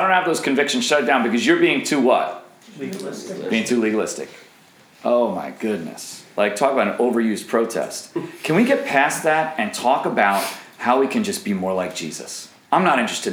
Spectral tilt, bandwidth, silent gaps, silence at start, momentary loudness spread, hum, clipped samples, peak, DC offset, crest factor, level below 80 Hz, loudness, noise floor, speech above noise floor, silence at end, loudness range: -4 dB/octave; over 20 kHz; none; 0 s; 13 LU; none; under 0.1%; -2 dBFS; under 0.1%; 18 dB; -74 dBFS; -20 LUFS; -50 dBFS; 31 dB; 0 s; 4 LU